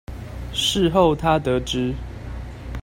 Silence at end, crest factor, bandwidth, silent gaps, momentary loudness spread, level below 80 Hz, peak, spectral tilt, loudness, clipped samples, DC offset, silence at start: 0 s; 18 dB; 16.5 kHz; none; 17 LU; -34 dBFS; -4 dBFS; -5 dB/octave; -20 LUFS; under 0.1%; under 0.1%; 0.1 s